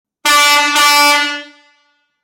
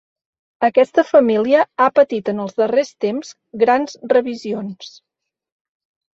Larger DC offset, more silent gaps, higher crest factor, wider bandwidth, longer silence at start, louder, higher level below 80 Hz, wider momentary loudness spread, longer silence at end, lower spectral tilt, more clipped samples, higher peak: neither; neither; about the same, 12 dB vs 16 dB; first, 17 kHz vs 7.8 kHz; second, 0.25 s vs 0.6 s; first, -9 LUFS vs -17 LUFS; first, -56 dBFS vs -66 dBFS; second, 9 LU vs 12 LU; second, 0.8 s vs 1.25 s; second, 2 dB/octave vs -5.5 dB/octave; neither; about the same, 0 dBFS vs -2 dBFS